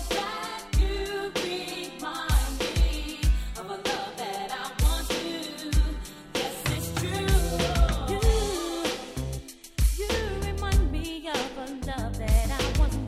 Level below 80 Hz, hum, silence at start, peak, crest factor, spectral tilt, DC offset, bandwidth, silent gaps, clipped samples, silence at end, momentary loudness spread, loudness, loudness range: -28 dBFS; none; 0 s; -10 dBFS; 16 dB; -4.5 dB/octave; under 0.1%; 15 kHz; none; under 0.1%; 0 s; 8 LU; -29 LUFS; 2 LU